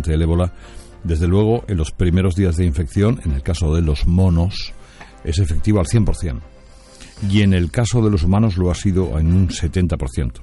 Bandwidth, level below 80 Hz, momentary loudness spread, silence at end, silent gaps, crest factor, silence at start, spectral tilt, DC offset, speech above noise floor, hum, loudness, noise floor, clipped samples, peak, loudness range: 11.5 kHz; -28 dBFS; 8 LU; 0 s; none; 14 dB; 0 s; -7 dB/octave; under 0.1%; 25 dB; none; -18 LUFS; -42 dBFS; under 0.1%; -4 dBFS; 3 LU